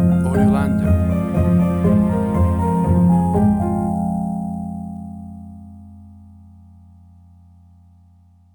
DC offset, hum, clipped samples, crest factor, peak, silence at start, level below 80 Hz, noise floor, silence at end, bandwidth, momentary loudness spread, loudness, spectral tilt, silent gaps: under 0.1%; none; under 0.1%; 14 dB; -4 dBFS; 0 s; -34 dBFS; -50 dBFS; 2.35 s; 19.5 kHz; 17 LU; -18 LUFS; -9.5 dB/octave; none